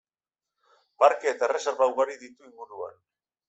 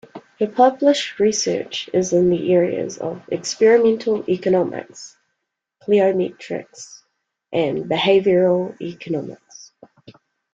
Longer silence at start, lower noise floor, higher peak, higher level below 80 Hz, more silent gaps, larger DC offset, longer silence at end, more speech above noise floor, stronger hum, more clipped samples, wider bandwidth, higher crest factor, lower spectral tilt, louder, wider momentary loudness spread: first, 1 s vs 0.15 s; first, under -90 dBFS vs -77 dBFS; second, -6 dBFS vs -2 dBFS; second, -78 dBFS vs -62 dBFS; neither; neither; second, 0.6 s vs 0.9 s; first, over 64 dB vs 59 dB; neither; neither; about the same, 8.2 kHz vs 9 kHz; about the same, 22 dB vs 18 dB; second, -1.5 dB/octave vs -5 dB/octave; second, -25 LUFS vs -19 LUFS; first, 21 LU vs 18 LU